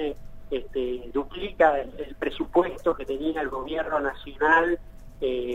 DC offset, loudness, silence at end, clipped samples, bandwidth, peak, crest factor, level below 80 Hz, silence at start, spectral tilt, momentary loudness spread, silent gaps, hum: under 0.1%; -26 LUFS; 0 s; under 0.1%; 13.5 kHz; -6 dBFS; 20 dB; -44 dBFS; 0 s; -6 dB/octave; 12 LU; none; none